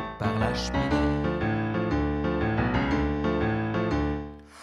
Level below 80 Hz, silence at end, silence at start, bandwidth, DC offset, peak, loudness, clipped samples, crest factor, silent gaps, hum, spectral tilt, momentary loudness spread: -36 dBFS; 0 s; 0 s; 11 kHz; under 0.1%; -10 dBFS; -27 LUFS; under 0.1%; 16 dB; none; none; -7 dB/octave; 3 LU